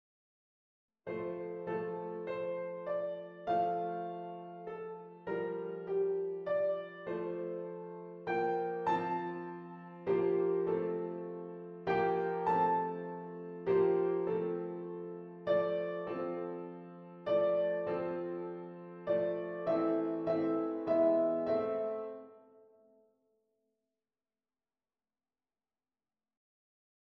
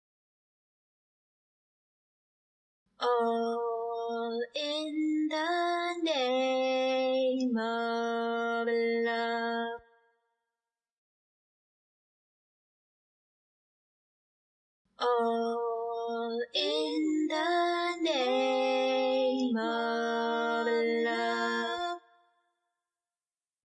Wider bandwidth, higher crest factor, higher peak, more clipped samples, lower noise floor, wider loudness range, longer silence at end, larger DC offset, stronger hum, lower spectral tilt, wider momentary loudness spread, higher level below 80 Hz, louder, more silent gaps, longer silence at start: second, 5.8 kHz vs 9.2 kHz; about the same, 18 dB vs 16 dB; about the same, -18 dBFS vs -18 dBFS; neither; about the same, under -90 dBFS vs under -90 dBFS; about the same, 5 LU vs 7 LU; first, 4.6 s vs 1.7 s; neither; neither; first, -9 dB/octave vs -3.5 dB/octave; first, 14 LU vs 6 LU; first, -76 dBFS vs -84 dBFS; second, -36 LUFS vs -30 LUFS; second, none vs 10.92-14.85 s; second, 1.05 s vs 3 s